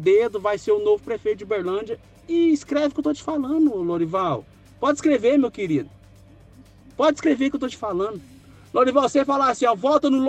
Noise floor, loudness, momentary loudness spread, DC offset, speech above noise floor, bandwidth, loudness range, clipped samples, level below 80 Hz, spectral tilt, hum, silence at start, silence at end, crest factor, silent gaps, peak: -48 dBFS; -22 LUFS; 8 LU; under 0.1%; 28 dB; 9 kHz; 2 LU; under 0.1%; -56 dBFS; -5.5 dB/octave; none; 0 s; 0 s; 18 dB; none; -4 dBFS